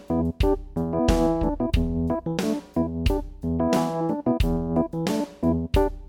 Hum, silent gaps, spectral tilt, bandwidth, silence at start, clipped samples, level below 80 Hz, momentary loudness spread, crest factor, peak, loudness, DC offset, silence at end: none; none; -7 dB/octave; 18 kHz; 0 s; under 0.1%; -30 dBFS; 4 LU; 18 dB; -6 dBFS; -25 LUFS; under 0.1%; 0.05 s